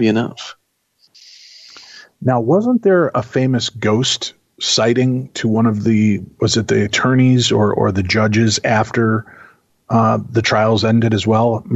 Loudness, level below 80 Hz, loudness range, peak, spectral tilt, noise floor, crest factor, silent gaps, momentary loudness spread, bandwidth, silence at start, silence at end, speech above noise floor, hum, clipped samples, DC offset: -15 LUFS; -52 dBFS; 3 LU; -4 dBFS; -5.5 dB/octave; -60 dBFS; 12 dB; none; 6 LU; 8.2 kHz; 0 s; 0 s; 45 dB; none; under 0.1%; under 0.1%